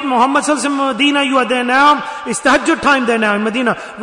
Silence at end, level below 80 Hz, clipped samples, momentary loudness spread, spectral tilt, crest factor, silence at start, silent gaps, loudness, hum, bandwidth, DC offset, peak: 0 s; -50 dBFS; under 0.1%; 6 LU; -3 dB/octave; 12 dB; 0 s; none; -13 LUFS; none; 11 kHz; under 0.1%; -2 dBFS